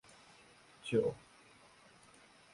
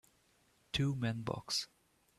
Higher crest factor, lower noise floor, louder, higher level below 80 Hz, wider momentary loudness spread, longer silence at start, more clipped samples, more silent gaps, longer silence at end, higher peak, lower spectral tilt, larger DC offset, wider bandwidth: about the same, 22 dB vs 20 dB; second, -63 dBFS vs -72 dBFS; about the same, -37 LUFS vs -37 LUFS; second, -74 dBFS vs -62 dBFS; first, 26 LU vs 6 LU; about the same, 0.85 s vs 0.75 s; neither; neither; first, 1.35 s vs 0.55 s; about the same, -20 dBFS vs -20 dBFS; first, -6 dB/octave vs -4.5 dB/octave; neither; second, 11.5 kHz vs 13.5 kHz